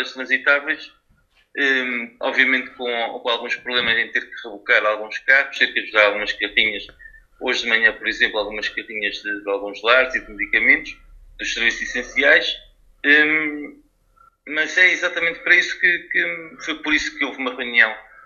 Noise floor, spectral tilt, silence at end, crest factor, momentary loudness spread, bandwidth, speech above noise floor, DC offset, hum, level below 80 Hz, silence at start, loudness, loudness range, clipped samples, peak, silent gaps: -60 dBFS; -1.5 dB/octave; 0.25 s; 20 dB; 12 LU; 7.4 kHz; 40 dB; under 0.1%; none; -52 dBFS; 0 s; -18 LUFS; 3 LU; under 0.1%; 0 dBFS; none